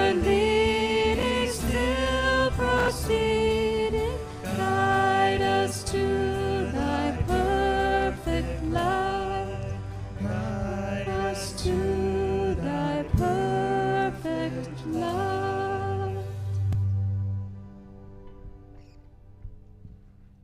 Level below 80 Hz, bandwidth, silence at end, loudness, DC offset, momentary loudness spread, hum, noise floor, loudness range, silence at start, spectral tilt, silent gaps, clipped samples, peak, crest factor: -38 dBFS; 15.5 kHz; 0.2 s; -26 LUFS; under 0.1%; 9 LU; none; -51 dBFS; 7 LU; 0 s; -5.5 dB/octave; none; under 0.1%; -10 dBFS; 16 dB